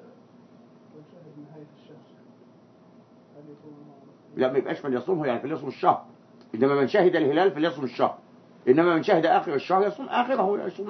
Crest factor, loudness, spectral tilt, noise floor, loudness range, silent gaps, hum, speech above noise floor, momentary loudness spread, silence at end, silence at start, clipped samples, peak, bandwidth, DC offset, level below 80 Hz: 20 dB; -24 LUFS; -7.5 dB/octave; -54 dBFS; 9 LU; none; none; 29 dB; 10 LU; 0 s; 0.95 s; under 0.1%; -6 dBFS; 6.2 kHz; under 0.1%; -78 dBFS